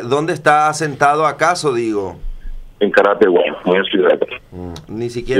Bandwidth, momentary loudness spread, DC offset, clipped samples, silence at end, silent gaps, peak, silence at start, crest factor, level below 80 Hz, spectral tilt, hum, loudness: 14 kHz; 16 LU; under 0.1%; under 0.1%; 0 s; none; 0 dBFS; 0 s; 16 dB; -34 dBFS; -5 dB/octave; none; -15 LUFS